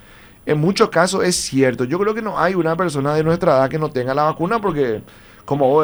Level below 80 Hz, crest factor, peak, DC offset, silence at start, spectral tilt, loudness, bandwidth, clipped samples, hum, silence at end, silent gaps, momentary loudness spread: -48 dBFS; 18 dB; 0 dBFS; under 0.1%; 0.45 s; -5 dB/octave; -18 LUFS; over 20 kHz; under 0.1%; none; 0 s; none; 6 LU